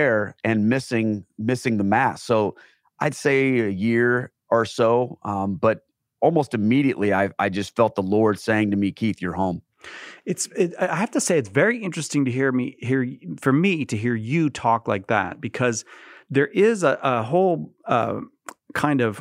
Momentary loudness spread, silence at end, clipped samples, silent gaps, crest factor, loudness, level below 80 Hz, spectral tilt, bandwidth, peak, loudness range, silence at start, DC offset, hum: 7 LU; 0 s; under 0.1%; none; 18 dB; -22 LUFS; -62 dBFS; -6 dB/octave; 15.5 kHz; -4 dBFS; 2 LU; 0 s; under 0.1%; none